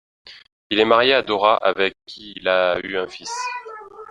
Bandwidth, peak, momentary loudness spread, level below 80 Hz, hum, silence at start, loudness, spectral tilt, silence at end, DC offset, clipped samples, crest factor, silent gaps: 10.5 kHz; -2 dBFS; 20 LU; -60 dBFS; none; 0.25 s; -19 LUFS; -3 dB/octave; 0 s; under 0.1%; under 0.1%; 20 dB; 0.52-0.70 s